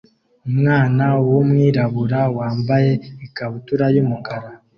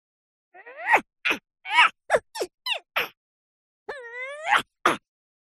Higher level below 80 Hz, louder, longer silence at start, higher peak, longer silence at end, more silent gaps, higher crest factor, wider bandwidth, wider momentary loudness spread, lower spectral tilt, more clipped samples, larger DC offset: first, -52 dBFS vs -68 dBFS; first, -17 LUFS vs -24 LUFS; about the same, 0.45 s vs 0.55 s; about the same, -4 dBFS vs -4 dBFS; second, 0.2 s vs 0.6 s; second, none vs 2.54-2.58 s, 3.17-3.86 s; second, 14 dB vs 22 dB; second, 5.8 kHz vs 13 kHz; second, 13 LU vs 18 LU; first, -10 dB/octave vs -1.5 dB/octave; neither; neither